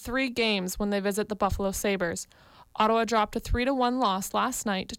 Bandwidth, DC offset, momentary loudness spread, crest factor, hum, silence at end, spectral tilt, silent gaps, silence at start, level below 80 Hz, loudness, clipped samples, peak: 17 kHz; under 0.1%; 5 LU; 14 dB; none; 0 s; -4 dB/octave; none; 0 s; -42 dBFS; -27 LUFS; under 0.1%; -14 dBFS